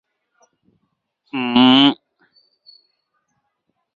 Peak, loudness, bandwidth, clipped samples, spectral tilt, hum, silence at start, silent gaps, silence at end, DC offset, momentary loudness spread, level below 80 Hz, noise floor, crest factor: -2 dBFS; -14 LUFS; 6.8 kHz; under 0.1%; -6 dB/octave; none; 1.35 s; none; 2 s; under 0.1%; 19 LU; -62 dBFS; -72 dBFS; 20 dB